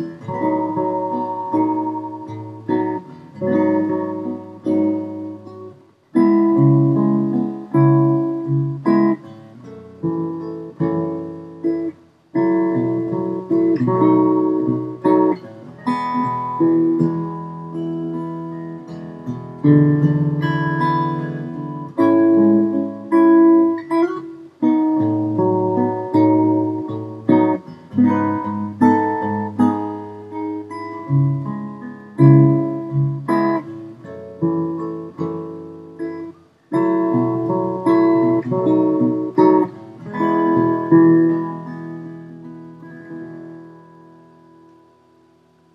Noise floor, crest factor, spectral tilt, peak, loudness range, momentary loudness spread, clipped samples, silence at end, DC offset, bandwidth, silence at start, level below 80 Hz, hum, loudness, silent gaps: -54 dBFS; 18 dB; -10.5 dB/octave; 0 dBFS; 6 LU; 18 LU; under 0.1%; 2 s; under 0.1%; 5.6 kHz; 0 s; -62 dBFS; none; -18 LUFS; none